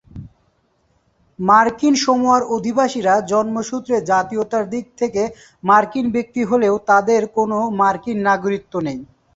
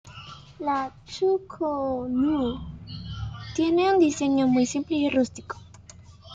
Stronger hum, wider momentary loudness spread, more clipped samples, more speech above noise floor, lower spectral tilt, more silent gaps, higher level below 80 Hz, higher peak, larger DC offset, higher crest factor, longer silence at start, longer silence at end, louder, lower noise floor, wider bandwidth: neither; second, 9 LU vs 18 LU; neither; first, 45 dB vs 24 dB; about the same, -5 dB/octave vs -5.5 dB/octave; neither; about the same, -54 dBFS vs -50 dBFS; first, -2 dBFS vs -10 dBFS; neither; about the same, 16 dB vs 16 dB; about the same, 0.15 s vs 0.05 s; first, 0.3 s vs 0 s; first, -17 LUFS vs -25 LUFS; first, -62 dBFS vs -48 dBFS; second, 8 kHz vs 9 kHz